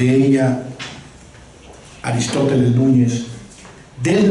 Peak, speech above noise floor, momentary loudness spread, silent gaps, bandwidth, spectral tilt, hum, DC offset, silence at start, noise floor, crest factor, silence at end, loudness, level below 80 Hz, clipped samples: -4 dBFS; 26 dB; 18 LU; none; 11.5 kHz; -6.5 dB/octave; none; under 0.1%; 0 s; -41 dBFS; 14 dB; 0 s; -17 LUFS; -50 dBFS; under 0.1%